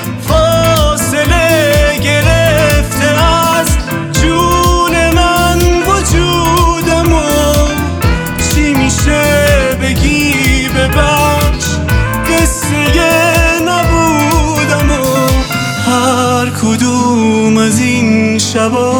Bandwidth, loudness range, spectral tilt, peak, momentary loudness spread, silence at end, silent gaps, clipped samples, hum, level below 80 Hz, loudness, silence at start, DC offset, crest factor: over 20 kHz; 1 LU; -4.5 dB/octave; 0 dBFS; 4 LU; 0 s; none; under 0.1%; none; -18 dBFS; -10 LUFS; 0 s; under 0.1%; 10 dB